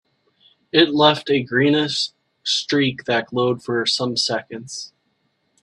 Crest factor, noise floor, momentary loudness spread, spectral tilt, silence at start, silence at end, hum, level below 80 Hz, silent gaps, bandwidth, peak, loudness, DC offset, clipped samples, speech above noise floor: 22 dB; -68 dBFS; 14 LU; -4 dB/octave; 0.75 s; 0.75 s; none; -64 dBFS; none; 11.5 kHz; 0 dBFS; -19 LUFS; under 0.1%; under 0.1%; 49 dB